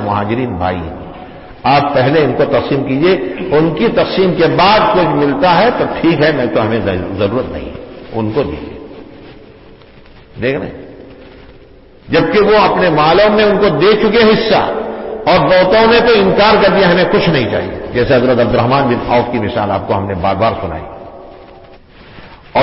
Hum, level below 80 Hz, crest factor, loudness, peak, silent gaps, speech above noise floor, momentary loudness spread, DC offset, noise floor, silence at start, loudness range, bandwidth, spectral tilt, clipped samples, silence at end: none; -36 dBFS; 12 dB; -12 LUFS; 0 dBFS; none; 28 dB; 15 LU; under 0.1%; -39 dBFS; 0 s; 12 LU; 5.8 kHz; -10 dB/octave; under 0.1%; 0 s